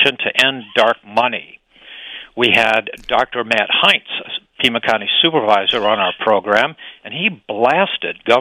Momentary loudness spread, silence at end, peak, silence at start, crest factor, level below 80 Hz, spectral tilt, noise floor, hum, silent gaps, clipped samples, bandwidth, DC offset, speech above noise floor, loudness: 13 LU; 0 s; 0 dBFS; 0 s; 16 dB; -54 dBFS; -3.5 dB/octave; -37 dBFS; none; none; under 0.1%; 16 kHz; under 0.1%; 21 dB; -15 LUFS